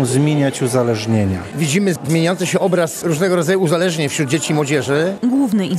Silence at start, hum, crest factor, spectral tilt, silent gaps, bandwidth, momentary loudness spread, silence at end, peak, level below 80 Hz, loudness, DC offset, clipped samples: 0 s; none; 12 dB; -5.5 dB/octave; none; 14 kHz; 3 LU; 0 s; -4 dBFS; -58 dBFS; -17 LUFS; under 0.1%; under 0.1%